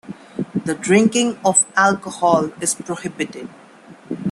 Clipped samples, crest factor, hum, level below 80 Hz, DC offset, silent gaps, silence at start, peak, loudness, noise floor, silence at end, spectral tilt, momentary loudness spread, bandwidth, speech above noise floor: under 0.1%; 18 dB; none; -60 dBFS; under 0.1%; none; 0.05 s; 0 dBFS; -18 LUFS; -44 dBFS; 0 s; -3.5 dB/octave; 16 LU; 12.5 kHz; 25 dB